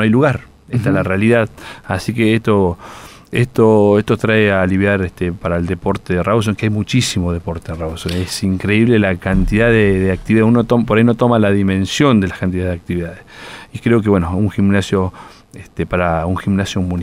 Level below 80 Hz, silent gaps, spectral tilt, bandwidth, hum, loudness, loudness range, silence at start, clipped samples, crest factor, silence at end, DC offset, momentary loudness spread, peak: -34 dBFS; none; -6.5 dB/octave; 15.5 kHz; none; -15 LUFS; 5 LU; 0 s; under 0.1%; 14 dB; 0 s; under 0.1%; 11 LU; 0 dBFS